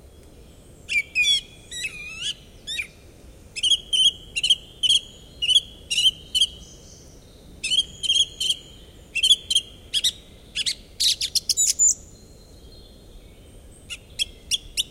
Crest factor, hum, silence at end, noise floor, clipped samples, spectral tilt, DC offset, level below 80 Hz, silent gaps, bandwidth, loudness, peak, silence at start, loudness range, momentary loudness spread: 20 dB; none; 0.05 s; -47 dBFS; under 0.1%; 2 dB/octave; under 0.1%; -50 dBFS; none; 16.5 kHz; -21 LUFS; -4 dBFS; 0.9 s; 4 LU; 13 LU